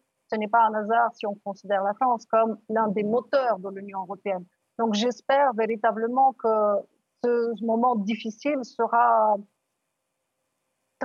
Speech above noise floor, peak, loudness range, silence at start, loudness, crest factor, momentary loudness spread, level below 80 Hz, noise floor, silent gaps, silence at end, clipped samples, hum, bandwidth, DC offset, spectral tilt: 55 dB; -10 dBFS; 2 LU; 0.3 s; -25 LUFS; 16 dB; 11 LU; -84 dBFS; -79 dBFS; none; 0 s; under 0.1%; none; 7.2 kHz; under 0.1%; -5.5 dB/octave